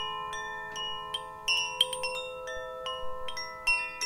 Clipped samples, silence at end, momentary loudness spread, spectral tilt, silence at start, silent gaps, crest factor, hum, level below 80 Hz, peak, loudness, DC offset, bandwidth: under 0.1%; 0 s; 10 LU; 0.5 dB/octave; 0 s; none; 24 dB; none; -56 dBFS; -10 dBFS; -32 LUFS; under 0.1%; 17 kHz